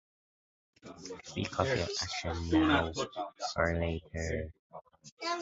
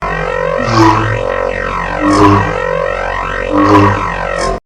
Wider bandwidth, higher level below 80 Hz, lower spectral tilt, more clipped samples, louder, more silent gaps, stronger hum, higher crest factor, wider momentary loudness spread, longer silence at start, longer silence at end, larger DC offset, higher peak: second, 7.6 kHz vs 11.5 kHz; second, -46 dBFS vs -26 dBFS; second, -4 dB/octave vs -6 dB/octave; second, under 0.1% vs 0.4%; second, -33 LUFS vs -12 LUFS; first, 4.59-4.70 s, 5.12-5.17 s vs none; neither; first, 22 dB vs 12 dB; first, 19 LU vs 8 LU; first, 0.85 s vs 0 s; about the same, 0 s vs 0.05 s; neither; second, -12 dBFS vs 0 dBFS